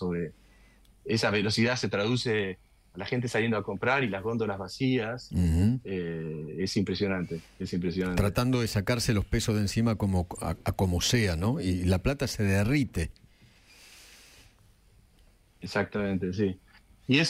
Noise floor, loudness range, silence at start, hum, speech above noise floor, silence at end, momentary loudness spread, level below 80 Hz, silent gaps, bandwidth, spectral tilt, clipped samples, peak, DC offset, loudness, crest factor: -60 dBFS; 7 LU; 0 s; none; 32 dB; 0 s; 9 LU; -44 dBFS; none; 16 kHz; -5.5 dB/octave; under 0.1%; -10 dBFS; under 0.1%; -29 LUFS; 18 dB